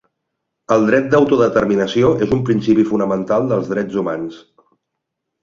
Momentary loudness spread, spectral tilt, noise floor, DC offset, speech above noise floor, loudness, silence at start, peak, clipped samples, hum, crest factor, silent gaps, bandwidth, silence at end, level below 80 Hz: 7 LU; -7 dB/octave; -78 dBFS; under 0.1%; 62 dB; -16 LUFS; 0.7 s; -2 dBFS; under 0.1%; none; 16 dB; none; 7.4 kHz; 1.05 s; -48 dBFS